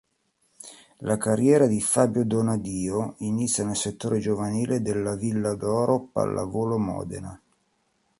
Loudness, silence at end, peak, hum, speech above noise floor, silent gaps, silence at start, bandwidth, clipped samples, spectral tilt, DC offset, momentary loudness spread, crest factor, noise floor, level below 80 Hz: -25 LUFS; 0.85 s; -6 dBFS; none; 46 dB; none; 0.65 s; 12 kHz; under 0.1%; -5.5 dB/octave; under 0.1%; 15 LU; 20 dB; -70 dBFS; -54 dBFS